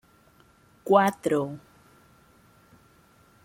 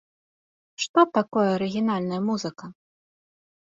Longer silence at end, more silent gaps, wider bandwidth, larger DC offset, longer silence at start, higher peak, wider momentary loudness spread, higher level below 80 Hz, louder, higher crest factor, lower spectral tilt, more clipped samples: first, 1.85 s vs 0.9 s; second, none vs 0.89-0.94 s; first, 16.5 kHz vs 7.8 kHz; neither; about the same, 0.85 s vs 0.8 s; about the same, -6 dBFS vs -6 dBFS; first, 22 LU vs 14 LU; about the same, -68 dBFS vs -68 dBFS; about the same, -24 LUFS vs -24 LUFS; about the same, 24 dB vs 20 dB; about the same, -6 dB/octave vs -5.5 dB/octave; neither